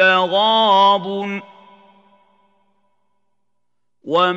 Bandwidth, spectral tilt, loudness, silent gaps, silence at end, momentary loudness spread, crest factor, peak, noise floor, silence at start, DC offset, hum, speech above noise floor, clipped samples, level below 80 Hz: 7.8 kHz; -5 dB/octave; -15 LUFS; none; 0 s; 14 LU; 18 dB; -2 dBFS; -78 dBFS; 0 s; under 0.1%; 60 Hz at -75 dBFS; 63 dB; under 0.1%; -84 dBFS